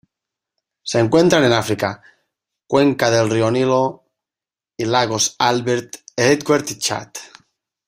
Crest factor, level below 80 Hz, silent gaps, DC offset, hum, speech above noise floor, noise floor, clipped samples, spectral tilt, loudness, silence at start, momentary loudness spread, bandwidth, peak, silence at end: 18 dB; -56 dBFS; none; under 0.1%; none; over 73 dB; under -90 dBFS; under 0.1%; -4 dB/octave; -17 LUFS; 0.85 s; 13 LU; 16 kHz; 0 dBFS; 0.6 s